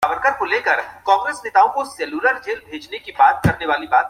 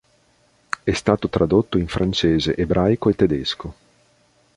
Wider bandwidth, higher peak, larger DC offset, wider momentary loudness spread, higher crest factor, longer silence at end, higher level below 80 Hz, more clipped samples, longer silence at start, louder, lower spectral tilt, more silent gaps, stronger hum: first, 15.5 kHz vs 11 kHz; about the same, -2 dBFS vs -2 dBFS; neither; first, 12 LU vs 8 LU; about the same, 16 dB vs 18 dB; second, 0 s vs 0.85 s; second, -46 dBFS vs -38 dBFS; neither; second, 0 s vs 0.85 s; about the same, -18 LUFS vs -20 LUFS; second, -5 dB/octave vs -6.5 dB/octave; neither; neither